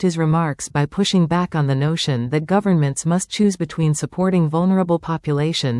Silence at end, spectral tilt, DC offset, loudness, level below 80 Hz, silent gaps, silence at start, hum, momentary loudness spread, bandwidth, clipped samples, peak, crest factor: 0 s; -6 dB/octave; under 0.1%; -19 LUFS; -50 dBFS; none; 0 s; none; 4 LU; 12 kHz; under 0.1%; -6 dBFS; 14 dB